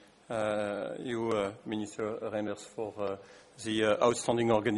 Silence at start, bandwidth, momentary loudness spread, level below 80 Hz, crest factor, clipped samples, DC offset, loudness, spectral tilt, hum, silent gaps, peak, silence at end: 0.3 s; 11.5 kHz; 11 LU; -68 dBFS; 20 dB; under 0.1%; under 0.1%; -33 LUFS; -5 dB/octave; none; none; -12 dBFS; 0 s